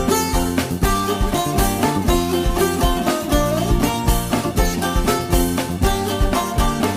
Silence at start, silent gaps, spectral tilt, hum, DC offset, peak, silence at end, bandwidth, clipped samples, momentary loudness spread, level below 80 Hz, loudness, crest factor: 0 s; none; -5 dB/octave; none; under 0.1%; -4 dBFS; 0 s; 16 kHz; under 0.1%; 2 LU; -24 dBFS; -19 LUFS; 14 dB